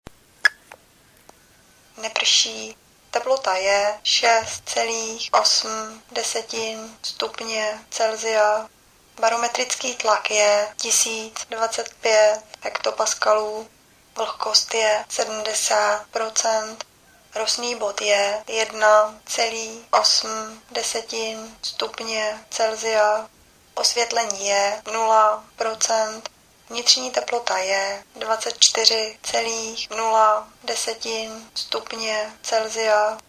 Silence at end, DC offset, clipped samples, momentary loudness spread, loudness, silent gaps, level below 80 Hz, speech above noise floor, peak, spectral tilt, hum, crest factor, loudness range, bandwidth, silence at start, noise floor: 0.1 s; under 0.1%; under 0.1%; 12 LU; -21 LUFS; none; -64 dBFS; 32 dB; 0 dBFS; 1 dB/octave; none; 22 dB; 3 LU; 16 kHz; 0.45 s; -54 dBFS